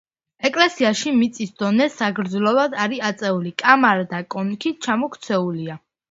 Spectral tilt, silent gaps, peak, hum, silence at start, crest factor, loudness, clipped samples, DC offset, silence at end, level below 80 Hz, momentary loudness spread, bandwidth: -4.5 dB/octave; none; 0 dBFS; none; 0.4 s; 20 dB; -20 LUFS; under 0.1%; under 0.1%; 0.35 s; -66 dBFS; 10 LU; 8 kHz